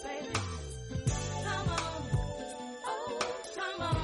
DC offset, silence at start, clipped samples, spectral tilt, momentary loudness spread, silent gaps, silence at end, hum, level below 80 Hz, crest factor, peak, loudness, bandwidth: under 0.1%; 0 s; under 0.1%; -4.5 dB/octave; 7 LU; none; 0 s; none; -46 dBFS; 16 dB; -20 dBFS; -36 LUFS; 11.5 kHz